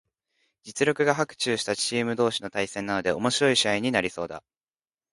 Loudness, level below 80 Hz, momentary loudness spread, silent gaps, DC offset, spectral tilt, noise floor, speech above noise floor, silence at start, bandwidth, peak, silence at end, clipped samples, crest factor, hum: -25 LUFS; -62 dBFS; 10 LU; none; under 0.1%; -3.5 dB/octave; under -90 dBFS; over 64 dB; 0.65 s; 11.5 kHz; -6 dBFS; 0.75 s; under 0.1%; 22 dB; none